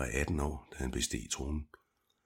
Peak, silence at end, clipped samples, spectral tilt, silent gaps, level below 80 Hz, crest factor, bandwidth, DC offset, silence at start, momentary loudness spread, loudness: -16 dBFS; 0.6 s; under 0.1%; -4 dB/octave; none; -42 dBFS; 20 dB; 16 kHz; under 0.1%; 0 s; 8 LU; -37 LUFS